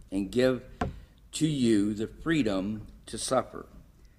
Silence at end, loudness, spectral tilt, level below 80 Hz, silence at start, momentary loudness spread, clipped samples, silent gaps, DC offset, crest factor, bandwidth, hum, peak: 0.35 s; -29 LUFS; -5.5 dB/octave; -50 dBFS; 0.1 s; 14 LU; under 0.1%; none; under 0.1%; 18 dB; 15.5 kHz; none; -10 dBFS